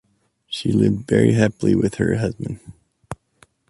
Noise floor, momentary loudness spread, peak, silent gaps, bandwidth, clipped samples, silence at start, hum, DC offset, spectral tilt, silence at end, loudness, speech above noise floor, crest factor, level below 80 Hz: -61 dBFS; 21 LU; -2 dBFS; none; 11.5 kHz; under 0.1%; 0.5 s; none; under 0.1%; -7 dB/octave; 0.55 s; -19 LUFS; 42 dB; 18 dB; -46 dBFS